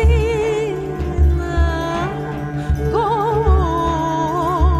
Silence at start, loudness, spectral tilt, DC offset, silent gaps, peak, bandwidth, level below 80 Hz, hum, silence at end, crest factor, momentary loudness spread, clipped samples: 0 s; -19 LUFS; -7.5 dB/octave; under 0.1%; none; -4 dBFS; 8.4 kHz; -20 dBFS; none; 0 s; 12 dB; 7 LU; under 0.1%